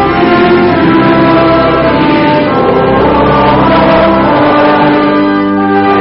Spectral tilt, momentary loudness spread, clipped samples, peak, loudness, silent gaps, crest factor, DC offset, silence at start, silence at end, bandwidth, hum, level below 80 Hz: -4.5 dB/octave; 2 LU; under 0.1%; 0 dBFS; -7 LUFS; none; 6 dB; under 0.1%; 0 s; 0 s; 5.8 kHz; none; -28 dBFS